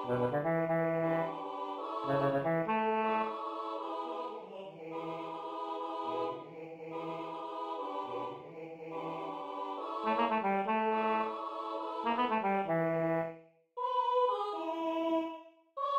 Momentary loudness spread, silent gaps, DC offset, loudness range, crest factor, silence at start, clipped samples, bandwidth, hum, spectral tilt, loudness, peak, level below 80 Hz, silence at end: 12 LU; none; under 0.1%; 8 LU; 16 dB; 0 s; under 0.1%; 15.5 kHz; none; -7.5 dB/octave; -35 LUFS; -18 dBFS; -76 dBFS; 0 s